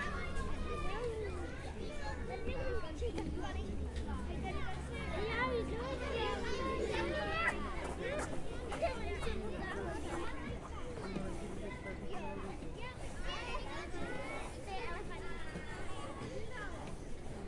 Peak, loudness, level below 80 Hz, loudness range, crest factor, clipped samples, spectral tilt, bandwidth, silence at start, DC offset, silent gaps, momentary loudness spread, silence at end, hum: -22 dBFS; -42 LUFS; -46 dBFS; 7 LU; 18 dB; under 0.1%; -5.5 dB/octave; 11.5 kHz; 0 s; under 0.1%; none; 9 LU; 0 s; none